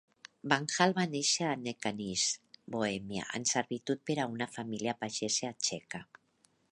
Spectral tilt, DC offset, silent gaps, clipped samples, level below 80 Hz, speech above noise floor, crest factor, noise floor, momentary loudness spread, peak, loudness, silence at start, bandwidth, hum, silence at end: -3 dB/octave; under 0.1%; none; under 0.1%; -72 dBFS; 38 dB; 26 dB; -72 dBFS; 10 LU; -8 dBFS; -33 LUFS; 0.45 s; 11.5 kHz; none; 0.7 s